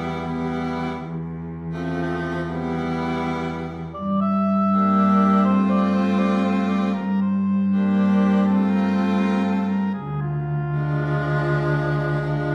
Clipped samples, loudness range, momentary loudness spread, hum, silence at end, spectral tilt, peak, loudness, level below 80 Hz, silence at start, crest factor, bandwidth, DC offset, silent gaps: under 0.1%; 7 LU; 9 LU; none; 0 s; -9 dB/octave; -8 dBFS; -22 LUFS; -48 dBFS; 0 s; 12 dB; 6.6 kHz; under 0.1%; none